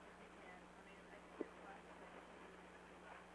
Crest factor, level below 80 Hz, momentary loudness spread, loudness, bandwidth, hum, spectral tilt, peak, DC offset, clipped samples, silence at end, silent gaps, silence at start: 26 dB; -76 dBFS; 7 LU; -58 LUFS; 11 kHz; 60 Hz at -70 dBFS; -5 dB/octave; -32 dBFS; under 0.1%; under 0.1%; 0 s; none; 0 s